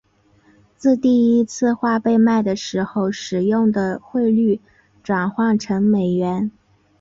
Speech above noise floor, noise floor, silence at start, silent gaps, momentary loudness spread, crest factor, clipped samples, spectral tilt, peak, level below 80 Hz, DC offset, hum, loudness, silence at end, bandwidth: 38 dB; -56 dBFS; 0.8 s; none; 7 LU; 12 dB; under 0.1%; -6.5 dB/octave; -6 dBFS; -58 dBFS; under 0.1%; none; -19 LUFS; 0.5 s; 7.6 kHz